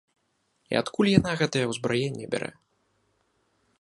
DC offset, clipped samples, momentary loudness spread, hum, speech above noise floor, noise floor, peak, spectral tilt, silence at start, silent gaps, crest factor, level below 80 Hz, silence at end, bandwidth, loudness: under 0.1%; under 0.1%; 10 LU; none; 47 dB; -73 dBFS; -2 dBFS; -5.5 dB/octave; 0.7 s; none; 26 dB; -54 dBFS; 1.3 s; 11.5 kHz; -26 LUFS